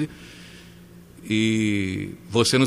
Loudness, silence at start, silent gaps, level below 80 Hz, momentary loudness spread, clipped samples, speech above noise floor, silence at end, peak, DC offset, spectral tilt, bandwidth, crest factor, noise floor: -24 LUFS; 0 s; none; -56 dBFS; 22 LU; under 0.1%; 24 dB; 0 s; -6 dBFS; under 0.1%; -4.5 dB/octave; 15.5 kHz; 18 dB; -46 dBFS